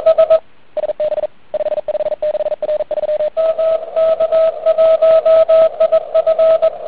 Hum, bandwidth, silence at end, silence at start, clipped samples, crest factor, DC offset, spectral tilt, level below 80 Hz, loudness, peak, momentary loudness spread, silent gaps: none; 4.6 kHz; 0 s; 0 s; under 0.1%; 12 dB; 1%; -8.5 dB/octave; -56 dBFS; -14 LUFS; -2 dBFS; 10 LU; none